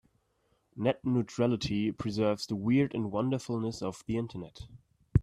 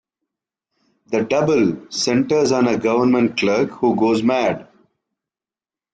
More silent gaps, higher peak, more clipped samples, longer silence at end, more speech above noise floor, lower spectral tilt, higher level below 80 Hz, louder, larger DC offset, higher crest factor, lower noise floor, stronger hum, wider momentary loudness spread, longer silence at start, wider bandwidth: neither; second, -10 dBFS vs -6 dBFS; neither; second, 0 s vs 1.3 s; second, 42 dB vs over 73 dB; first, -7 dB/octave vs -5 dB/octave; first, -50 dBFS vs -58 dBFS; second, -31 LUFS vs -18 LUFS; neither; first, 20 dB vs 14 dB; second, -73 dBFS vs under -90 dBFS; neither; first, 15 LU vs 6 LU; second, 0.75 s vs 1.1 s; first, 12.5 kHz vs 9.2 kHz